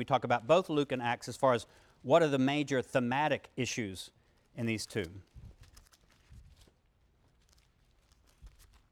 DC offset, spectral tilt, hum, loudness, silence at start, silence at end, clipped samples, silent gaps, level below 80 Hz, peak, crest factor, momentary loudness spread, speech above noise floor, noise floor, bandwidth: under 0.1%; -5 dB/octave; none; -32 LUFS; 0 s; 0.45 s; under 0.1%; none; -64 dBFS; -12 dBFS; 22 dB; 18 LU; 38 dB; -70 dBFS; 16 kHz